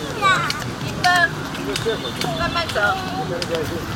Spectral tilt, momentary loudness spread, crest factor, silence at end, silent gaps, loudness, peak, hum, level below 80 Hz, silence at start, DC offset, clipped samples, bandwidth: -4 dB/octave; 8 LU; 18 dB; 0 s; none; -20 LUFS; -2 dBFS; none; -42 dBFS; 0 s; under 0.1%; under 0.1%; 17 kHz